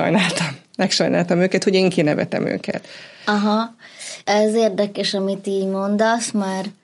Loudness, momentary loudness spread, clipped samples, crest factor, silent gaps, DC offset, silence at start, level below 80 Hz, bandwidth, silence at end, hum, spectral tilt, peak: -19 LUFS; 11 LU; under 0.1%; 16 dB; none; under 0.1%; 0 s; -68 dBFS; 11.5 kHz; 0.1 s; none; -5 dB/octave; -4 dBFS